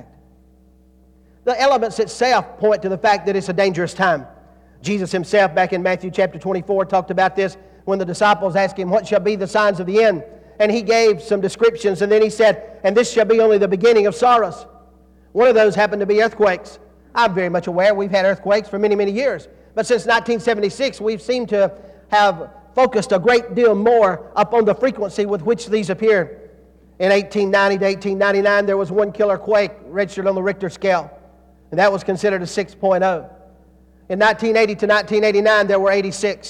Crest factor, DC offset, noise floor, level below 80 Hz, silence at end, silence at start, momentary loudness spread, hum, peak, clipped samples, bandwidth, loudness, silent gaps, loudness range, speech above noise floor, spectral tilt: 14 dB; under 0.1%; -51 dBFS; -52 dBFS; 0 s; 1.45 s; 8 LU; none; -4 dBFS; under 0.1%; 11 kHz; -17 LUFS; none; 4 LU; 34 dB; -5 dB/octave